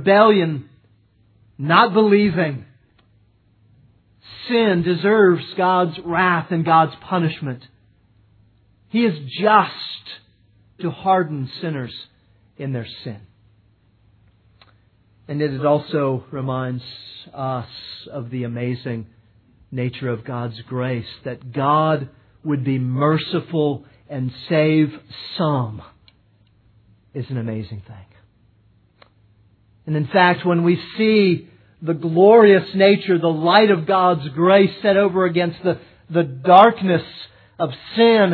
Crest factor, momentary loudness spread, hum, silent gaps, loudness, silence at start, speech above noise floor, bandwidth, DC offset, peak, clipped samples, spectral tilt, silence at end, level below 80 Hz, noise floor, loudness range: 20 dB; 19 LU; none; none; -18 LUFS; 0 s; 39 dB; 4.6 kHz; under 0.1%; 0 dBFS; under 0.1%; -9.5 dB/octave; 0 s; -60 dBFS; -57 dBFS; 13 LU